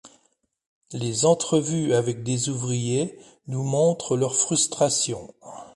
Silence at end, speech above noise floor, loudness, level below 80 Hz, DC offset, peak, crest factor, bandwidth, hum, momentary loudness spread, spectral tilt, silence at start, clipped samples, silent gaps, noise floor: 0.1 s; 45 dB; -23 LUFS; -62 dBFS; under 0.1%; -6 dBFS; 18 dB; 11.5 kHz; none; 12 LU; -4.5 dB/octave; 0.05 s; under 0.1%; 0.66-0.81 s; -69 dBFS